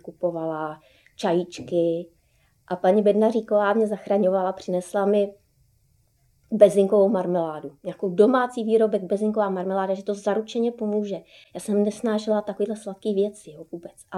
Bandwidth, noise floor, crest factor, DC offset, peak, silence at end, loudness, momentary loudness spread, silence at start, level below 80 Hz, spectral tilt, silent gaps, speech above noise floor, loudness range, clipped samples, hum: 12.5 kHz; -64 dBFS; 22 dB; under 0.1%; -2 dBFS; 0 s; -23 LUFS; 14 LU; 0.05 s; -68 dBFS; -6.5 dB/octave; none; 41 dB; 5 LU; under 0.1%; none